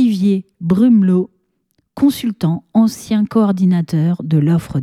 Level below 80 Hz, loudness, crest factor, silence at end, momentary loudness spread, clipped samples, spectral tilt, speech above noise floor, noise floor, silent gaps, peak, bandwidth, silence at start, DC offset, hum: -50 dBFS; -15 LUFS; 12 dB; 0 s; 7 LU; under 0.1%; -8 dB/octave; 51 dB; -65 dBFS; none; -2 dBFS; 14.5 kHz; 0 s; under 0.1%; none